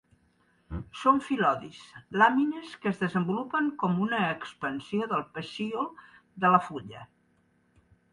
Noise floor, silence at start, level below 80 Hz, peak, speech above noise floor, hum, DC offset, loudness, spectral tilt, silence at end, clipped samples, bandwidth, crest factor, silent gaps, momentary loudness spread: -68 dBFS; 0.7 s; -58 dBFS; -8 dBFS; 40 dB; none; under 0.1%; -28 LUFS; -6.5 dB/octave; 1.1 s; under 0.1%; 11 kHz; 22 dB; none; 17 LU